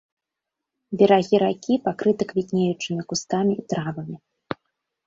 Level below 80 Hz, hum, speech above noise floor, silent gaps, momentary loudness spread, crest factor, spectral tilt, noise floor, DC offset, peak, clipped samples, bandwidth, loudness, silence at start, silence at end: -64 dBFS; none; 63 dB; none; 18 LU; 20 dB; -6 dB/octave; -85 dBFS; under 0.1%; -4 dBFS; under 0.1%; 7.8 kHz; -22 LUFS; 0.9 s; 0.9 s